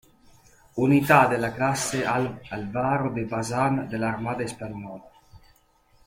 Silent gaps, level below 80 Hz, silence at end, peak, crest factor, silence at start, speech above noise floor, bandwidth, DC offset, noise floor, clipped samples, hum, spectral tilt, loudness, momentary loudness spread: none; -56 dBFS; 0.7 s; -4 dBFS; 22 dB; 0.75 s; 37 dB; 16.5 kHz; under 0.1%; -61 dBFS; under 0.1%; none; -5.5 dB/octave; -24 LUFS; 18 LU